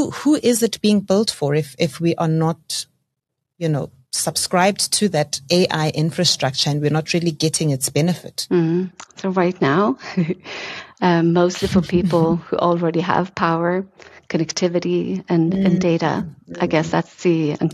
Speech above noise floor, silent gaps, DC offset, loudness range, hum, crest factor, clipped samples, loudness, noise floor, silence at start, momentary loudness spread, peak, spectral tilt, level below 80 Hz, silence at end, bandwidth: 60 dB; none; under 0.1%; 3 LU; none; 18 dB; under 0.1%; -19 LUFS; -79 dBFS; 0 s; 9 LU; -2 dBFS; -5 dB/octave; -52 dBFS; 0 s; 13 kHz